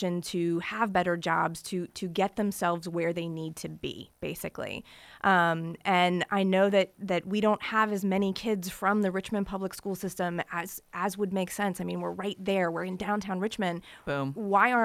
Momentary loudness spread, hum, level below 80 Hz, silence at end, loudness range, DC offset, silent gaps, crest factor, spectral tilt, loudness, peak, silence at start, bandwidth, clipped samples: 12 LU; none; -62 dBFS; 0 s; 6 LU; under 0.1%; none; 20 dB; -5.5 dB/octave; -29 LUFS; -10 dBFS; 0 s; 16 kHz; under 0.1%